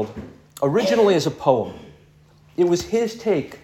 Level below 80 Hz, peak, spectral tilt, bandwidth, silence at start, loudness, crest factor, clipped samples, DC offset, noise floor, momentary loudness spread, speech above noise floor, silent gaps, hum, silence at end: -54 dBFS; -2 dBFS; -5.5 dB/octave; 17 kHz; 0 s; -20 LUFS; 20 dB; under 0.1%; under 0.1%; -52 dBFS; 16 LU; 32 dB; none; none; 0.05 s